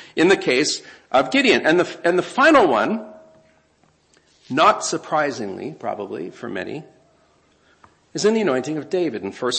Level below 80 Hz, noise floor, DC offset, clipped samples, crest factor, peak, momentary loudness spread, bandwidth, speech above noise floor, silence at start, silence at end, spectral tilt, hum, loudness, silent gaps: -62 dBFS; -60 dBFS; under 0.1%; under 0.1%; 20 dB; -2 dBFS; 15 LU; 8.8 kHz; 41 dB; 0 s; 0 s; -3.5 dB/octave; none; -19 LUFS; none